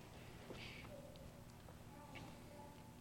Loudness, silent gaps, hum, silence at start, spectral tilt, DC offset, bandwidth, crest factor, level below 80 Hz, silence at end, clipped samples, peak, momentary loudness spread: -56 LUFS; none; 60 Hz at -65 dBFS; 0 s; -5 dB/octave; under 0.1%; 16.5 kHz; 16 dB; -66 dBFS; 0 s; under 0.1%; -40 dBFS; 6 LU